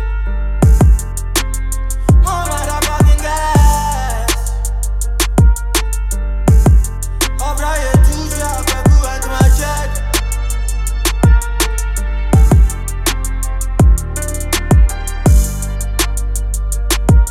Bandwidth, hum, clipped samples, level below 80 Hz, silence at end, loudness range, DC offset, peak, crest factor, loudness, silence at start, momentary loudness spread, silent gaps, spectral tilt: 16 kHz; none; under 0.1%; -14 dBFS; 0 s; 1 LU; under 0.1%; 0 dBFS; 12 dB; -15 LUFS; 0 s; 8 LU; none; -5 dB/octave